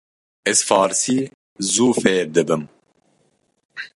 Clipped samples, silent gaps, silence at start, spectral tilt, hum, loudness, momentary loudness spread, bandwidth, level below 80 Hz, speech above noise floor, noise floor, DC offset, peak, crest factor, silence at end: under 0.1%; 1.34-1.56 s, 3.65-3.69 s; 0.45 s; -3 dB/octave; none; -18 LUFS; 17 LU; 11.5 kHz; -62 dBFS; 47 dB; -65 dBFS; under 0.1%; -2 dBFS; 18 dB; 0.1 s